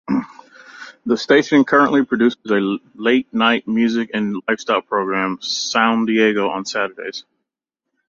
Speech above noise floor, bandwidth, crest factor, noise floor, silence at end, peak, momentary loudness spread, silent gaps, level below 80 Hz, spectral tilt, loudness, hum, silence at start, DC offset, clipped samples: 64 dB; 7.6 kHz; 16 dB; -82 dBFS; 0.9 s; -2 dBFS; 11 LU; none; -62 dBFS; -4.5 dB/octave; -17 LUFS; none; 0.1 s; under 0.1%; under 0.1%